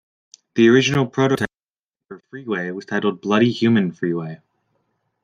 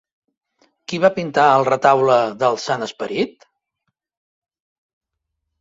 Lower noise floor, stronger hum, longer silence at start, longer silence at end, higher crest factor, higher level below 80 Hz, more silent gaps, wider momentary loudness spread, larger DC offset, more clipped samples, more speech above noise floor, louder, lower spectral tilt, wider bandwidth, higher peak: first, -89 dBFS vs -78 dBFS; neither; second, 0.55 s vs 0.9 s; second, 0.9 s vs 2.3 s; about the same, 18 dB vs 18 dB; first, -60 dBFS vs -66 dBFS; first, 1.70-1.89 s vs none; first, 14 LU vs 11 LU; neither; neither; first, 71 dB vs 61 dB; about the same, -19 LUFS vs -17 LUFS; about the same, -6 dB/octave vs -5 dB/octave; first, 11.5 kHz vs 7.8 kHz; about the same, -2 dBFS vs -2 dBFS